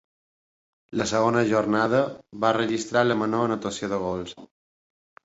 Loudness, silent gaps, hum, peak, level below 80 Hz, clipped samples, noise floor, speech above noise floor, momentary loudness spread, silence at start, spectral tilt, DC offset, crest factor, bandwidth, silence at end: -24 LUFS; none; none; -6 dBFS; -58 dBFS; under 0.1%; under -90 dBFS; over 66 dB; 9 LU; 0.9 s; -5 dB/octave; under 0.1%; 18 dB; 8 kHz; 0.8 s